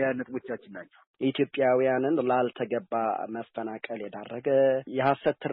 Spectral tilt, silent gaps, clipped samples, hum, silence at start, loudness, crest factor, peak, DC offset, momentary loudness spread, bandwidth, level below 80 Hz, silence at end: -4.5 dB/octave; 1.07-1.14 s; under 0.1%; none; 0 s; -28 LUFS; 16 dB; -12 dBFS; under 0.1%; 13 LU; 4.2 kHz; -72 dBFS; 0 s